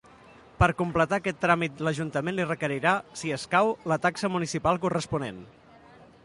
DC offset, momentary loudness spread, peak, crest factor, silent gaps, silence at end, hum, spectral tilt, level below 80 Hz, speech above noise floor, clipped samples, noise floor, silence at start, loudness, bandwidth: under 0.1%; 7 LU; -6 dBFS; 20 dB; none; 0.2 s; none; -5.5 dB/octave; -48 dBFS; 26 dB; under 0.1%; -53 dBFS; 0.6 s; -27 LUFS; 11.5 kHz